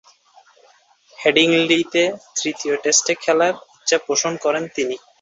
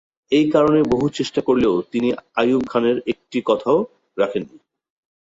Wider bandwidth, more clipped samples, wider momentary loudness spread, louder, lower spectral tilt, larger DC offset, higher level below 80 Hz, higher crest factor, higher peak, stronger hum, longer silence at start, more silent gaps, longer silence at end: about the same, 8 kHz vs 8 kHz; neither; about the same, 9 LU vs 8 LU; about the same, -18 LUFS vs -19 LUFS; second, -2 dB/octave vs -6.5 dB/octave; neither; second, -66 dBFS vs -52 dBFS; about the same, 18 dB vs 18 dB; about the same, -2 dBFS vs -2 dBFS; neither; first, 1.2 s vs 0.3 s; neither; second, 0.25 s vs 0.85 s